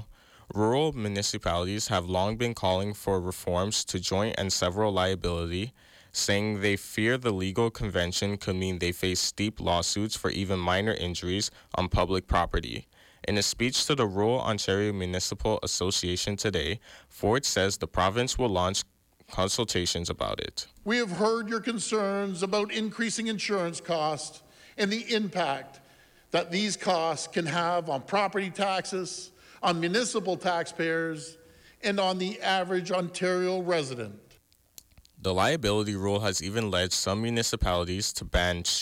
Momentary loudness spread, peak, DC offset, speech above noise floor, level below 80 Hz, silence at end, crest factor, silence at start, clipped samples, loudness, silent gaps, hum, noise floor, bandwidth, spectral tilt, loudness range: 6 LU; -12 dBFS; under 0.1%; 33 dB; -46 dBFS; 0 s; 16 dB; 0 s; under 0.1%; -28 LUFS; none; none; -62 dBFS; 17 kHz; -4 dB/octave; 2 LU